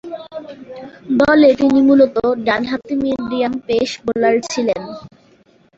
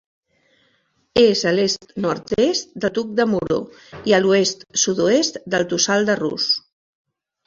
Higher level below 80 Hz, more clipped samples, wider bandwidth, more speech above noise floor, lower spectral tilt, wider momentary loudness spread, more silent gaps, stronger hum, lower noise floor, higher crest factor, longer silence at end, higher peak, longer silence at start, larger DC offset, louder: about the same, -50 dBFS vs -54 dBFS; neither; about the same, 8 kHz vs 7.8 kHz; second, 37 dB vs 45 dB; first, -5 dB/octave vs -3.5 dB/octave; first, 21 LU vs 8 LU; neither; neither; second, -52 dBFS vs -64 dBFS; about the same, 14 dB vs 18 dB; second, 0.7 s vs 0.9 s; about the same, -2 dBFS vs -2 dBFS; second, 0.05 s vs 1.15 s; neither; first, -15 LUFS vs -19 LUFS